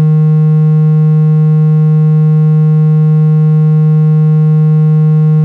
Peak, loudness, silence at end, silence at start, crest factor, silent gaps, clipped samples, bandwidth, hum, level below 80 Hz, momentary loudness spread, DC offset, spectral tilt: -4 dBFS; -8 LUFS; 0 s; 0 s; 4 dB; none; under 0.1%; 2.5 kHz; none; -62 dBFS; 0 LU; under 0.1%; -12.5 dB/octave